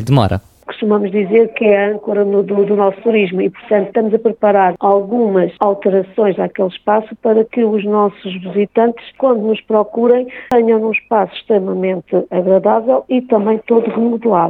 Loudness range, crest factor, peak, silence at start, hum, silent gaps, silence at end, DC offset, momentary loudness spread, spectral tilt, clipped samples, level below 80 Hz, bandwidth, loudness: 1 LU; 12 dB; 0 dBFS; 0 s; none; none; 0 s; under 0.1%; 5 LU; -8.5 dB/octave; under 0.1%; -50 dBFS; 6.2 kHz; -14 LUFS